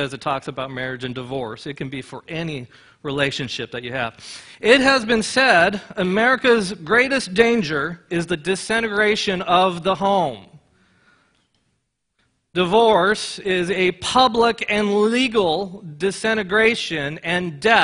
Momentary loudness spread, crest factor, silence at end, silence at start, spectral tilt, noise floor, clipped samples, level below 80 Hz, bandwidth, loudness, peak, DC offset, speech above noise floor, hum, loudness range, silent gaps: 13 LU; 20 dB; 0 s; 0 s; -4 dB/octave; -72 dBFS; under 0.1%; -52 dBFS; 11 kHz; -19 LUFS; 0 dBFS; under 0.1%; 52 dB; none; 10 LU; none